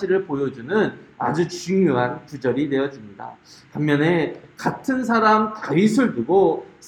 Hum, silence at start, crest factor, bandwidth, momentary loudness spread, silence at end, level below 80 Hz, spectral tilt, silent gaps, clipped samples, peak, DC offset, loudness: none; 0 s; 16 dB; 13 kHz; 10 LU; 0 s; -60 dBFS; -6.5 dB/octave; none; under 0.1%; -4 dBFS; under 0.1%; -21 LUFS